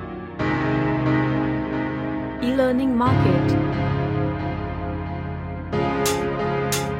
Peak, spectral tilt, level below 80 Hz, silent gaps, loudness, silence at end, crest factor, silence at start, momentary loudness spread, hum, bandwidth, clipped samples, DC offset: -4 dBFS; -6 dB/octave; -40 dBFS; none; -23 LUFS; 0 s; 18 dB; 0 s; 10 LU; none; 16 kHz; under 0.1%; under 0.1%